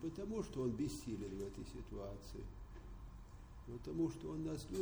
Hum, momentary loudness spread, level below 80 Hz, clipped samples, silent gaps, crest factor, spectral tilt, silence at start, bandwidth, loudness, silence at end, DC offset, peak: none; 15 LU; -56 dBFS; under 0.1%; none; 16 dB; -6.5 dB/octave; 0 s; over 20 kHz; -45 LUFS; 0 s; under 0.1%; -30 dBFS